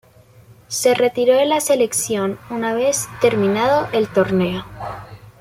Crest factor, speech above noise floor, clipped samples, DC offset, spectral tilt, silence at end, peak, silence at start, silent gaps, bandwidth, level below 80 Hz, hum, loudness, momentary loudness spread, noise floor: 16 dB; 30 dB; under 0.1%; under 0.1%; -4 dB/octave; 0.1 s; -2 dBFS; 0.7 s; none; 16.5 kHz; -52 dBFS; none; -18 LUFS; 12 LU; -47 dBFS